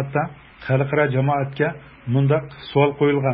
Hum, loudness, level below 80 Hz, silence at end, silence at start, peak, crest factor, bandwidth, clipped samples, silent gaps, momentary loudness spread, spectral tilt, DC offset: none; -21 LUFS; -52 dBFS; 0 s; 0 s; -2 dBFS; 18 dB; 5.2 kHz; under 0.1%; none; 7 LU; -12.5 dB/octave; under 0.1%